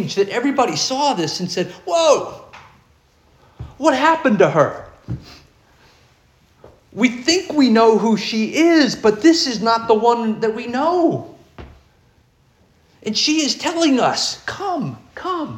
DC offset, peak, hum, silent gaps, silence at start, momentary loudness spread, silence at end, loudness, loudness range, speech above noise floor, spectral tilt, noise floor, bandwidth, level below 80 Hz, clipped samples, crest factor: under 0.1%; -2 dBFS; none; none; 0 s; 15 LU; 0 s; -17 LUFS; 6 LU; 39 dB; -4 dB/octave; -56 dBFS; 13 kHz; -52 dBFS; under 0.1%; 18 dB